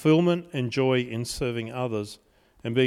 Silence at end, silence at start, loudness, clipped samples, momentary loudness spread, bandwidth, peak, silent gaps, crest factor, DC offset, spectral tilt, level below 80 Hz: 0 s; 0 s; -26 LUFS; under 0.1%; 11 LU; 15 kHz; -10 dBFS; none; 16 dB; under 0.1%; -6 dB/octave; -52 dBFS